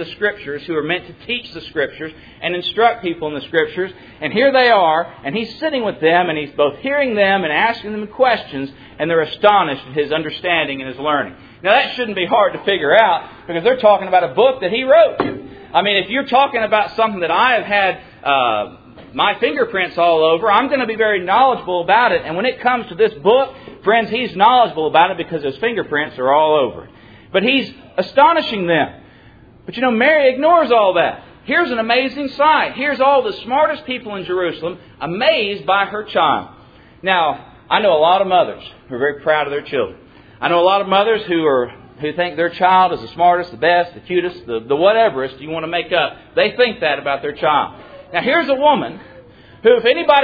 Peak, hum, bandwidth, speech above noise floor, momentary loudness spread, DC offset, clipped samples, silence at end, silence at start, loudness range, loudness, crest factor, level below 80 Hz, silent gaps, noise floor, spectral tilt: 0 dBFS; none; 5 kHz; 28 dB; 11 LU; under 0.1%; under 0.1%; 0 s; 0 s; 3 LU; -16 LUFS; 16 dB; -54 dBFS; none; -44 dBFS; -7 dB/octave